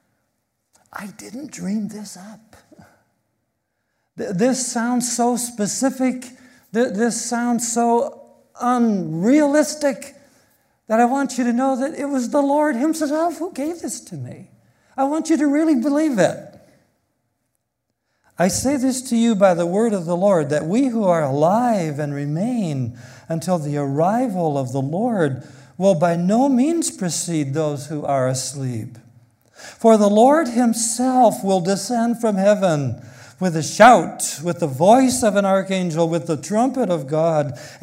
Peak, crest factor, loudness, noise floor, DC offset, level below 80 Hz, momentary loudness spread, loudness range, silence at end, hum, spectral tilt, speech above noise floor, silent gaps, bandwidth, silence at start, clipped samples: 0 dBFS; 20 dB; -19 LUFS; -76 dBFS; under 0.1%; -60 dBFS; 13 LU; 7 LU; 0.05 s; none; -5.5 dB/octave; 57 dB; none; 16 kHz; 0.95 s; under 0.1%